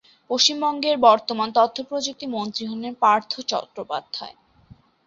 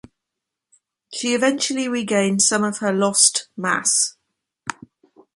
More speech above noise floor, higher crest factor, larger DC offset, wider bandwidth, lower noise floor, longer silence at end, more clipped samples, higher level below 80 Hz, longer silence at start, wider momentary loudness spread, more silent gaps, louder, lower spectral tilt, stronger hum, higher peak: second, 30 dB vs 64 dB; about the same, 20 dB vs 20 dB; neither; second, 7.8 kHz vs 11.5 kHz; second, -52 dBFS vs -83 dBFS; about the same, 0.75 s vs 0.65 s; neither; about the same, -66 dBFS vs -66 dBFS; second, 0.3 s vs 1.1 s; second, 13 LU vs 18 LU; neither; second, -21 LUFS vs -18 LUFS; about the same, -2.5 dB/octave vs -2 dB/octave; neither; about the same, -2 dBFS vs -2 dBFS